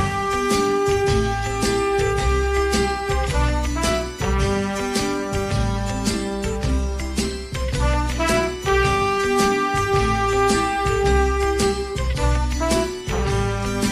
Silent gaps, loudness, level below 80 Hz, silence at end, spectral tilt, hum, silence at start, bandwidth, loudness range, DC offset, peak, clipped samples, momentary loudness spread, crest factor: none; -21 LUFS; -26 dBFS; 0 s; -5 dB/octave; none; 0 s; 14 kHz; 4 LU; under 0.1%; -6 dBFS; under 0.1%; 6 LU; 14 dB